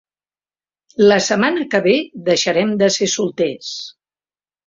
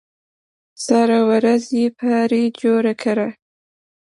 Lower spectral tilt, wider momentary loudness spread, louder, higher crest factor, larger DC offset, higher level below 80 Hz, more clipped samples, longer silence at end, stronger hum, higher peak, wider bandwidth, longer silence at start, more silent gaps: second, -3.5 dB/octave vs -5.5 dB/octave; first, 14 LU vs 6 LU; about the same, -16 LUFS vs -17 LUFS; about the same, 16 dB vs 16 dB; neither; first, -60 dBFS vs -68 dBFS; neither; about the same, 0.75 s vs 0.8 s; first, 50 Hz at -70 dBFS vs none; about the same, -2 dBFS vs -4 dBFS; second, 7.8 kHz vs 11.5 kHz; first, 1 s vs 0.8 s; neither